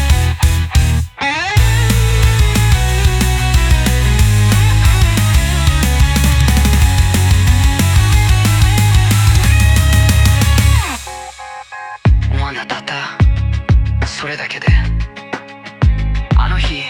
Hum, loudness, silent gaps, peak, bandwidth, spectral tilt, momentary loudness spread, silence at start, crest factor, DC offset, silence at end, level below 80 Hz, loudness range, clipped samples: none; -13 LUFS; none; 0 dBFS; 18 kHz; -4.5 dB/octave; 10 LU; 0 s; 12 dB; under 0.1%; 0 s; -16 dBFS; 6 LU; under 0.1%